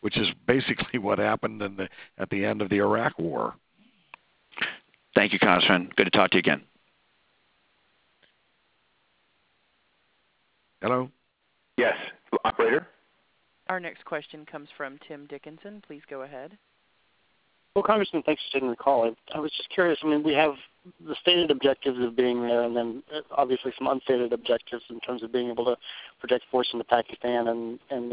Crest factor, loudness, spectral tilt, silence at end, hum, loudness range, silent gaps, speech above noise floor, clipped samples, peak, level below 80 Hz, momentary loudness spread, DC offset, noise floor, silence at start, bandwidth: 26 dB; -26 LUFS; -8.5 dB/octave; 0 s; none; 13 LU; none; 45 dB; under 0.1%; -2 dBFS; -64 dBFS; 19 LU; under 0.1%; -71 dBFS; 0.05 s; 4 kHz